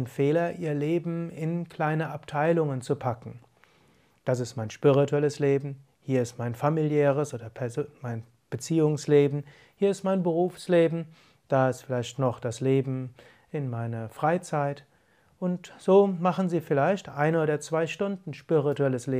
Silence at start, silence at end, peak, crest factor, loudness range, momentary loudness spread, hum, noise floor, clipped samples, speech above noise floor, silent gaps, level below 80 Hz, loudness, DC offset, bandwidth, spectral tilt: 0 s; 0 s; -8 dBFS; 18 dB; 4 LU; 13 LU; none; -64 dBFS; under 0.1%; 38 dB; none; -70 dBFS; -27 LUFS; under 0.1%; 15 kHz; -7 dB/octave